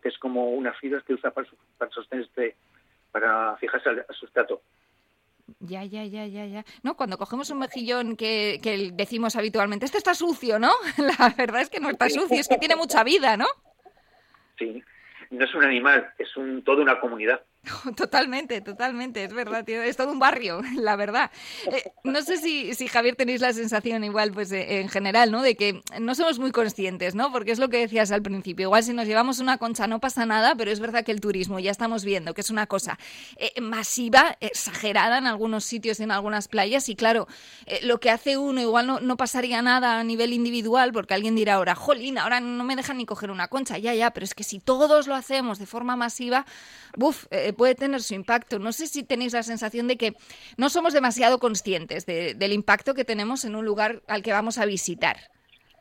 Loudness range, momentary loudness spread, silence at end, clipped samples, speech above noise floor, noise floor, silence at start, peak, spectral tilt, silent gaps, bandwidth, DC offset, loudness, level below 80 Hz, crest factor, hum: 6 LU; 11 LU; 0.6 s; under 0.1%; 43 dB; -67 dBFS; 0.05 s; -2 dBFS; -3 dB/octave; none; 16.5 kHz; under 0.1%; -24 LUFS; -64 dBFS; 22 dB; none